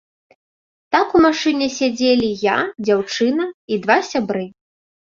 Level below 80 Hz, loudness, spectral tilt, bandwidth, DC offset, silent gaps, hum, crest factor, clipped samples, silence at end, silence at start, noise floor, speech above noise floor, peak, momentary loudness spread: -54 dBFS; -18 LUFS; -4 dB/octave; 7.6 kHz; under 0.1%; 3.54-3.68 s; none; 18 dB; under 0.1%; 0.55 s; 0.9 s; under -90 dBFS; over 73 dB; -2 dBFS; 9 LU